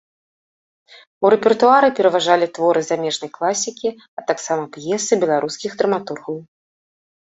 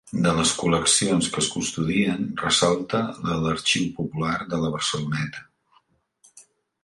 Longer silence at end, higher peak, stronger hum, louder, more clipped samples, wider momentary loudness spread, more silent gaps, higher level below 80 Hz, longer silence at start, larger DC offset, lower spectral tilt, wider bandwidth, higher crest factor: first, 0.8 s vs 0.4 s; first, -2 dBFS vs -6 dBFS; neither; first, -18 LUFS vs -23 LUFS; neither; first, 13 LU vs 8 LU; first, 4.08-4.17 s vs none; second, -66 dBFS vs -50 dBFS; first, 1.2 s vs 0.05 s; neither; about the same, -3.5 dB/octave vs -3.5 dB/octave; second, 8.2 kHz vs 11.5 kHz; about the same, 18 dB vs 20 dB